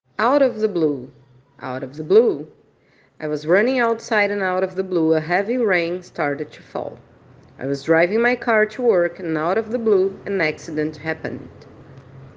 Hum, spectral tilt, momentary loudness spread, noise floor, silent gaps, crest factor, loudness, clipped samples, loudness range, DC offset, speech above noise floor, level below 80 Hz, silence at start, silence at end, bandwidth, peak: none; -6.5 dB/octave; 13 LU; -57 dBFS; none; 18 dB; -20 LUFS; under 0.1%; 3 LU; under 0.1%; 37 dB; -64 dBFS; 0.2 s; 0.1 s; 7.6 kHz; -4 dBFS